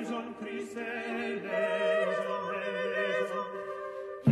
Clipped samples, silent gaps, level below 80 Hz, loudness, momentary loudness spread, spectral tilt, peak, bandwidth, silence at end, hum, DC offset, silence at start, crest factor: under 0.1%; none; -76 dBFS; -33 LUFS; 10 LU; -6.5 dB/octave; -12 dBFS; 12.5 kHz; 0 s; none; under 0.1%; 0 s; 20 dB